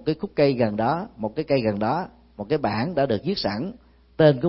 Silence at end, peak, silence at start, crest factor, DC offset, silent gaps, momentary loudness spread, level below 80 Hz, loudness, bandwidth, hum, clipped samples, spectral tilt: 0 s; -4 dBFS; 0 s; 20 dB; under 0.1%; none; 10 LU; -52 dBFS; -24 LUFS; 5.8 kHz; none; under 0.1%; -10.5 dB/octave